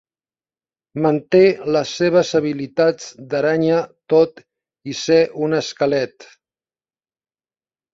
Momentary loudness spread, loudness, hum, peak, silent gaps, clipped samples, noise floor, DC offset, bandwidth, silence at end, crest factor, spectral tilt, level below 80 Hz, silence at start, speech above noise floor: 11 LU; -18 LUFS; none; -2 dBFS; none; under 0.1%; under -90 dBFS; under 0.1%; 7.8 kHz; 1.7 s; 18 dB; -5.5 dB/octave; -62 dBFS; 0.95 s; over 73 dB